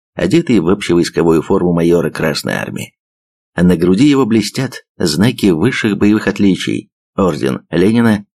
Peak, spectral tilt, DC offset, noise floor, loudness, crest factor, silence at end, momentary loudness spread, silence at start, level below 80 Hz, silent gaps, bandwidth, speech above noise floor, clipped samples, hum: -2 dBFS; -6 dB/octave; 0.3%; under -90 dBFS; -13 LUFS; 12 dB; 0.15 s; 10 LU; 0.15 s; -46 dBFS; 2.99-3.53 s, 4.89-4.95 s, 6.92-7.13 s; 14.5 kHz; over 77 dB; under 0.1%; none